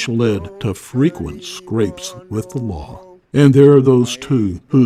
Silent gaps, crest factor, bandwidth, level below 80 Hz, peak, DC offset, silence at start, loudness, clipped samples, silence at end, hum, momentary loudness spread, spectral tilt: none; 16 dB; 14 kHz; -42 dBFS; 0 dBFS; under 0.1%; 0 s; -15 LUFS; under 0.1%; 0 s; none; 18 LU; -7 dB/octave